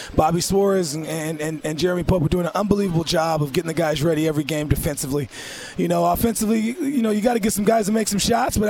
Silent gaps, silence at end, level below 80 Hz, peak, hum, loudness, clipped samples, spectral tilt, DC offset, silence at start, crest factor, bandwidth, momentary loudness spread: none; 0 s; -38 dBFS; 0 dBFS; none; -21 LUFS; under 0.1%; -5 dB/octave; under 0.1%; 0 s; 20 dB; 17.5 kHz; 7 LU